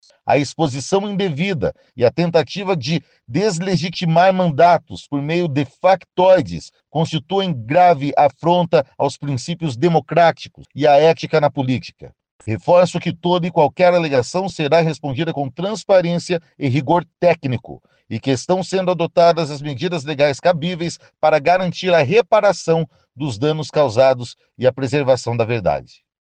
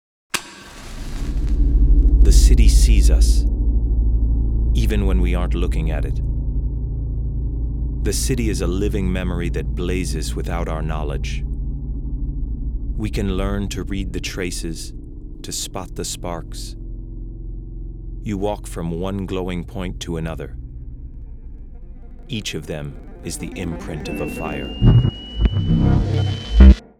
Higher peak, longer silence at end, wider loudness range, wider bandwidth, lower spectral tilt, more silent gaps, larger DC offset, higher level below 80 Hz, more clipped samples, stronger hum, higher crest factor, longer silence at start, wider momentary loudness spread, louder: second, -4 dBFS vs 0 dBFS; first, 0.4 s vs 0.15 s; second, 3 LU vs 13 LU; second, 9.6 kHz vs 14 kHz; about the same, -6 dB/octave vs -6 dB/octave; first, 12.31-12.39 s vs none; neither; second, -54 dBFS vs -20 dBFS; neither; neither; about the same, 14 dB vs 18 dB; about the same, 0.25 s vs 0.35 s; second, 11 LU vs 19 LU; first, -17 LUFS vs -21 LUFS